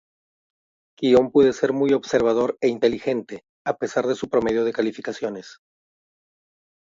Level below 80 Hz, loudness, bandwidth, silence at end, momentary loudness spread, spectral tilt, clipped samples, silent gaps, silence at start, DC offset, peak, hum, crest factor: -58 dBFS; -22 LUFS; 7.6 kHz; 1.4 s; 12 LU; -5.5 dB/octave; under 0.1%; 3.49-3.65 s; 1 s; under 0.1%; -4 dBFS; none; 18 dB